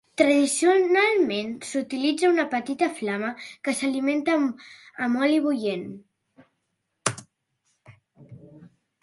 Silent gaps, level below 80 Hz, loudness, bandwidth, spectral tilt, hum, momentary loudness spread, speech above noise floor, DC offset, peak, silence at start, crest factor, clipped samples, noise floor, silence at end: none; -72 dBFS; -24 LUFS; 11.5 kHz; -3.5 dB/octave; none; 12 LU; 54 dB; under 0.1%; -4 dBFS; 0.2 s; 20 dB; under 0.1%; -77 dBFS; 0.4 s